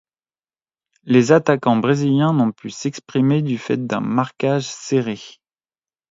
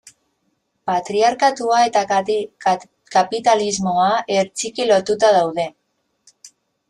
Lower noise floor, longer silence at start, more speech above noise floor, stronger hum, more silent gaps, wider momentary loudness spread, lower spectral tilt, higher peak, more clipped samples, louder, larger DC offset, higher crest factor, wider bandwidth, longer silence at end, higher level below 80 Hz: first, under -90 dBFS vs -69 dBFS; first, 1.05 s vs 0.85 s; first, over 72 dB vs 52 dB; neither; neither; first, 11 LU vs 8 LU; first, -6.5 dB/octave vs -3.5 dB/octave; about the same, 0 dBFS vs -2 dBFS; neither; about the same, -19 LUFS vs -18 LUFS; neither; about the same, 18 dB vs 16 dB; second, 7.8 kHz vs 11.5 kHz; first, 0.8 s vs 0.45 s; about the same, -62 dBFS vs -62 dBFS